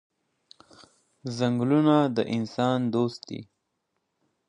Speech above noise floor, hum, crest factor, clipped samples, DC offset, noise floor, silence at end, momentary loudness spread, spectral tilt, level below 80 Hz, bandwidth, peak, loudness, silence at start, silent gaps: 54 dB; none; 20 dB; under 0.1%; under 0.1%; -78 dBFS; 1.05 s; 18 LU; -7 dB/octave; -72 dBFS; 10 kHz; -8 dBFS; -25 LUFS; 1.25 s; none